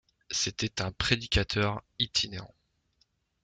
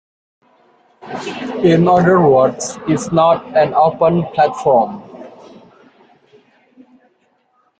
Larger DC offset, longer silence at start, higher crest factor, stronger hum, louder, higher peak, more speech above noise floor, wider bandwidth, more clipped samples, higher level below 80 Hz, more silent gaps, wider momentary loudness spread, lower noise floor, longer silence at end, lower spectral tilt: neither; second, 0.3 s vs 1.05 s; first, 28 dB vs 14 dB; neither; second, -29 LUFS vs -14 LUFS; second, -6 dBFS vs -2 dBFS; second, 42 dB vs 47 dB; about the same, 9.4 kHz vs 9.2 kHz; neither; first, -46 dBFS vs -54 dBFS; neither; second, 7 LU vs 16 LU; first, -73 dBFS vs -60 dBFS; second, 0.95 s vs 2.5 s; second, -3 dB/octave vs -6.5 dB/octave